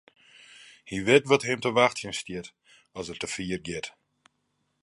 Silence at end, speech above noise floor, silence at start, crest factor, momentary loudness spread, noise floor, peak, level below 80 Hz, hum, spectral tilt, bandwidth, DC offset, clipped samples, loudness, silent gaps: 0.95 s; 49 dB; 0.6 s; 24 dB; 19 LU; -75 dBFS; -4 dBFS; -60 dBFS; none; -4 dB/octave; 11.5 kHz; under 0.1%; under 0.1%; -26 LUFS; none